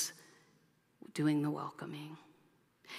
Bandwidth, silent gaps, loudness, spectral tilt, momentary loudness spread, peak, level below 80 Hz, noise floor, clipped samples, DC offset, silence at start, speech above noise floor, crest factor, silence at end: 15.5 kHz; none; -38 LUFS; -5 dB/octave; 24 LU; -22 dBFS; -86 dBFS; -71 dBFS; under 0.1%; under 0.1%; 0 s; 35 dB; 20 dB; 0 s